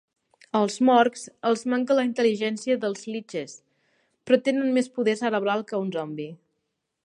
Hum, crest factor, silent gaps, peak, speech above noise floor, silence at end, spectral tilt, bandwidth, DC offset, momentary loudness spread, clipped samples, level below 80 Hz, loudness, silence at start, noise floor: none; 20 dB; none; -6 dBFS; 55 dB; 0.7 s; -5 dB/octave; 11 kHz; under 0.1%; 13 LU; under 0.1%; -78 dBFS; -24 LUFS; 0.55 s; -79 dBFS